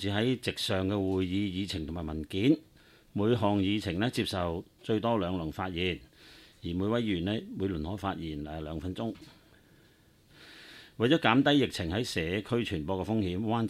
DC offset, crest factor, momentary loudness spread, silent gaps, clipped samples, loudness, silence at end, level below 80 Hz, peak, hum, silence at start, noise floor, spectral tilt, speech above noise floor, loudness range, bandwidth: under 0.1%; 24 dB; 11 LU; none; under 0.1%; -31 LUFS; 0 s; -54 dBFS; -8 dBFS; none; 0 s; -62 dBFS; -6 dB/octave; 32 dB; 7 LU; 15 kHz